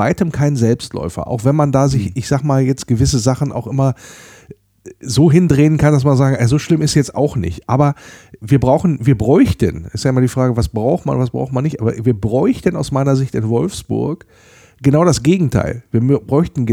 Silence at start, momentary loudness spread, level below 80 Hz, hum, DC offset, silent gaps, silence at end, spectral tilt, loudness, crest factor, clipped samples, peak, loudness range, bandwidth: 0 s; 8 LU; -38 dBFS; none; under 0.1%; none; 0 s; -7 dB/octave; -15 LUFS; 14 dB; under 0.1%; 0 dBFS; 3 LU; 14 kHz